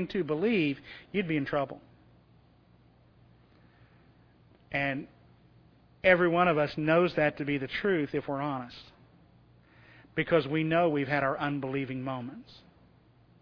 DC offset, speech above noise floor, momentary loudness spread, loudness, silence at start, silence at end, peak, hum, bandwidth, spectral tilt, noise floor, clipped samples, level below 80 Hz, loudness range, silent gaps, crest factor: under 0.1%; 32 dB; 14 LU; -29 LUFS; 0 s; 0.9 s; -8 dBFS; none; 5.4 kHz; -8.5 dB/octave; -61 dBFS; under 0.1%; -62 dBFS; 12 LU; none; 24 dB